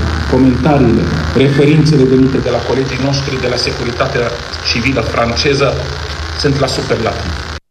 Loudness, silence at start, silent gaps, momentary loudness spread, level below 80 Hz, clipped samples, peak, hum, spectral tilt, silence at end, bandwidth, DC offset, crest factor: -13 LUFS; 0 s; none; 9 LU; -26 dBFS; under 0.1%; 0 dBFS; none; -6 dB/octave; 0.15 s; 12 kHz; under 0.1%; 12 dB